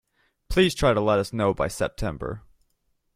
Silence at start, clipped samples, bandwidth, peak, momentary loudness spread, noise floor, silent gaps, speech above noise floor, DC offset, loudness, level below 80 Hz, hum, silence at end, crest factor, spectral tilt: 0.5 s; under 0.1%; 16 kHz; -6 dBFS; 14 LU; -71 dBFS; none; 48 dB; under 0.1%; -24 LUFS; -40 dBFS; none; 0.75 s; 20 dB; -5.5 dB/octave